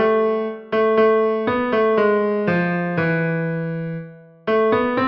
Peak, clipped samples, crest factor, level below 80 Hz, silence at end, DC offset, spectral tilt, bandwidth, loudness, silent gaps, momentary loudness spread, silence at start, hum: -6 dBFS; under 0.1%; 12 dB; -58 dBFS; 0 s; under 0.1%; -9 dB/octave; 5.6 kHz; -19 LUFS; none; 10 LU; 0 s; none